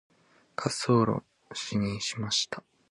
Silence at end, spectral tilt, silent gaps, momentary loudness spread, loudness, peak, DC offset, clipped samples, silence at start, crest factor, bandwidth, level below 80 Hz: 0.3 s; -4.5 dB/octave; none; 15 LU; -29 LUFS; -10 dBFS; under 0.1%; under 0.1%; 0.6 s; 20 dB; 11.5 kHz; -60 dBFS